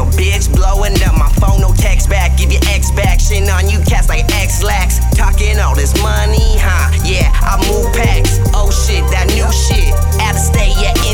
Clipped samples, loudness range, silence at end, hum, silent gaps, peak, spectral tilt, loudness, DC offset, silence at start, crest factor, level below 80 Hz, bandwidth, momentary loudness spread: under 0.1%; 0 LU; 0 s; none; none; 0 dBFS; -4.5 dB/octave; -12 LUFS; 0.5%; 0 s; 10 dB; -12 dBFS; 17.5 kHz; 1 LU